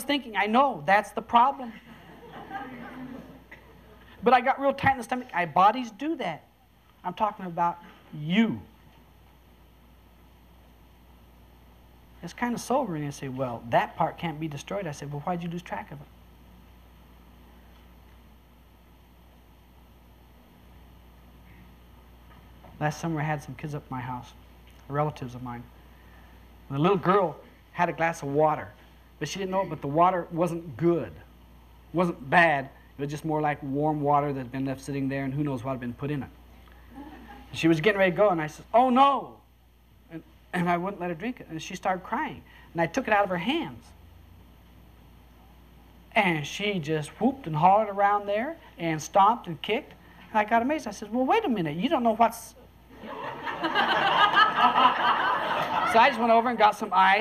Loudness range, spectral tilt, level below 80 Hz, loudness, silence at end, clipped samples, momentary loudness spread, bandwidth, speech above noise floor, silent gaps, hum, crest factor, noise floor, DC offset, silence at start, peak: 11 LU; -5.5 dB/octave; -56 dBFS; -26 LUFS; 0 s; under 0.1%; 19 LU; 15 kHz; 33 dB; none; none; 22 dB; -59 dBFS; under 0.1%; 0 s; -6 dBFS